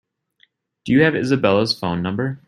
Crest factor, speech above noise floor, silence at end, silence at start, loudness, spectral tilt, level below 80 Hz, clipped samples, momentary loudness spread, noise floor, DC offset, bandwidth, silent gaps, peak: 18 dB; 43 dB; 0.1 s; 0.85 s; -18 LUFS; -6.5 dB/octave; -54 dBFS; under 0.1%; 7 LU; -61 dBFS; under 0.1%; 14 kHz; none; -2 dBFS